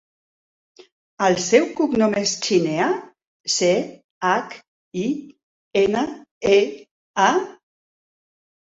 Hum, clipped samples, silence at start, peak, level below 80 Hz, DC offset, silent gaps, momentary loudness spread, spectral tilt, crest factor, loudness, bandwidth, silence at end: none; under 0.1%; 1.2 s; -2 dBFS; -62 dBFS; under 0.1%; 3.27-3.44 s, 4.04-4.21 s, 4.68-4.91 s, 5.43-5.71 s, 6.31-6.41 s, 6.91-7.14 s; 15 LU; -3.5 dB/octave; 20 dB; -21 LUFS; 8 kHz; 1.1 s